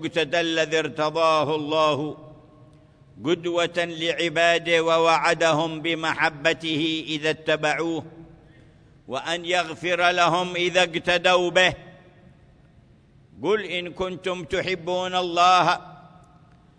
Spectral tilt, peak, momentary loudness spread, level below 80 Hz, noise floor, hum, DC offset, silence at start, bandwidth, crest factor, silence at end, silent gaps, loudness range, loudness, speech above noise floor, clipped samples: -4 dB/octave; -6 dBFS; 10 LU; -58 dBFS; -54 dBFS; none; under 0.1%; 0 s; 10.5 kHz; 18 dB; 0.7 s; none; 5 LU; -22 LUFS; 32 dB; under 0.1%